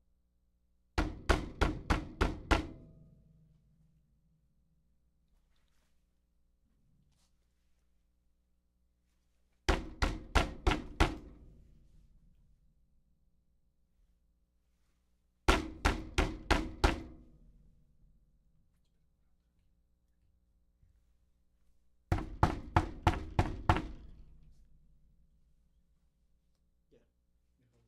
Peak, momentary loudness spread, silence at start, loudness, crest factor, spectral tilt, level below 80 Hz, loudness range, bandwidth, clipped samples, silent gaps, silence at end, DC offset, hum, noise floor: -10 dBFS; 7 LU; 0.95 s; -34 LUFS; 28 dB; -5.5 dB/octave; -42 dBFS; 7 LU; 14 kHz; under 0.1%; none; 3.65 s; under 0.1%; 60 Hz at -65 dBFS; -75 dBFS